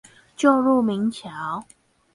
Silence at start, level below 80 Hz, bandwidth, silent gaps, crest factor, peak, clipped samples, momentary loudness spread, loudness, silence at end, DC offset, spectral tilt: 0.4 s; -64 dBFS; 11.5 kHz; none; 18 dB; -4 dBFS; under 0.1%; 13 LU; -22 LUFS; 0.5 s; under 0.1%; -6 dB/octave